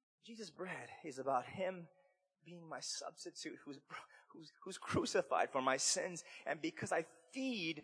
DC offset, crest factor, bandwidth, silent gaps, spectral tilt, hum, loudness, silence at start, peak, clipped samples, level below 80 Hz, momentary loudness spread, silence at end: under 0.1%; 22 dB; 10.5 kHz; none; -3 dB/octave; none; -41 LUFS; 0.25 s; -20 dBFS; under 0.1%; -78 dBFS; 19 LU; 0 s